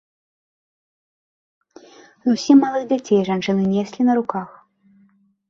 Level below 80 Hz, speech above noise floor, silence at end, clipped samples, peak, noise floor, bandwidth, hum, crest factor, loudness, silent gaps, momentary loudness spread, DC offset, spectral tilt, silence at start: -64 dBFS; 40 dB; 1 s; under 0.1%; -4 dBFS; -58 dBFS; 7.4 kHz; none; 18 dB; -19 LUFS; none; 12 LU; under 0.1%; -6.5 dB/octave; 2.25 s